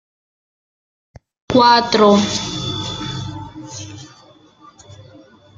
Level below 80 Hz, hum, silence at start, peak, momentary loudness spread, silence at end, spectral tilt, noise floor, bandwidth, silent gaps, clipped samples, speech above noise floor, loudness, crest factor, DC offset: -48 dBFS; none; 1.5 s; -2 dBFS; 21 LU; 0.65 s; -4.5 dB/octave; -48 dBFS; 8.8 kHz; none; under 0.1%; 35 dB; -15 LUFS; 18 dB; under 0.1%